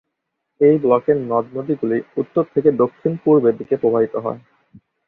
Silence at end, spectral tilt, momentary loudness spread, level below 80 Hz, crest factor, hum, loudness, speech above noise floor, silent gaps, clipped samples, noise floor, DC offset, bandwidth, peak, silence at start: 0.7 s; -11.5 dB/octave; 8 LU; -62 dBFS; 18 dB; none; -18 LUFS; 59 dB; none; under 0.1%; -77 dBFS; under 0.1%; 3.8 kHz; -2 dBFS; 0.6 s